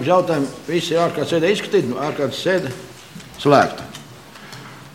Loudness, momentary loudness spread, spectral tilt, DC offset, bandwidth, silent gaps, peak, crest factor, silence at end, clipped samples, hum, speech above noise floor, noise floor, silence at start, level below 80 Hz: -19 LUFS; 22 LU; -5.5 dB/octave; 0.2%; 16.5 kHz; none; 0 dBFS; 20 dB; 0.05 s; under 0.1%; none; 21 dB; -40 dBFS; 0 s; -58 dBFS